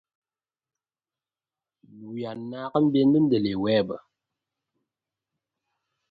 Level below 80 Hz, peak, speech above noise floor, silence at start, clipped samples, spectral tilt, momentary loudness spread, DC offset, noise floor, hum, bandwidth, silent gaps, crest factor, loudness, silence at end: -64 dBFS; -8 dBFS; over 67 dB; 1.95 s; under 0.1%; -10 dB/octave; 15 LU; under 0.1%; under -90 dBFS; none; 4.9 kHz; none; 20 dB; -24 LUFS; 2.1 s